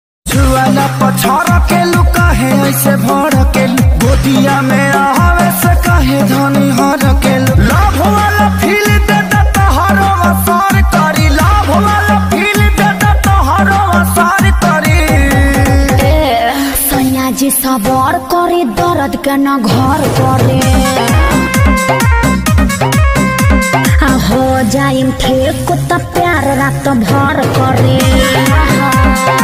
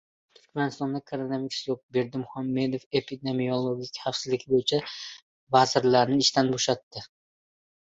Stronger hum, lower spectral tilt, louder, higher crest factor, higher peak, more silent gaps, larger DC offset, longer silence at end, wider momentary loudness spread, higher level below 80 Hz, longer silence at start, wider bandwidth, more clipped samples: neither; about the same, -5.5 dB/octave vs -4.5 dB/octave; first, -9 LUFS vs -27 LUFS; second, 8 dB vs 22 dB; first, 0 dBFS vs -6 dBFS; second, none vs 1.83-1.89 s, 2.86-2.91 s, 5.22-5.47 s, 6.83-6.91 s; neither; second, 0 s vs 0.75 s; second, 3 LU vs 11 LU; first, -16 dBFS vs -66 dBFS; second, 0.25 s vs 0.55 s; first, 16 kHz vs 8 kHz; neither